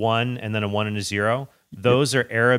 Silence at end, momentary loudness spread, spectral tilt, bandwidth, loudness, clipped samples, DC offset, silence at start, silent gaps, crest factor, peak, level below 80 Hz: 0 s; 6 LU; -5 dB/octave; 15.5 kHz; -22 LUFS; under 0.1%; under 0.1%; 0 s; none; 16 dB; -4 dBFS; -60 dBFS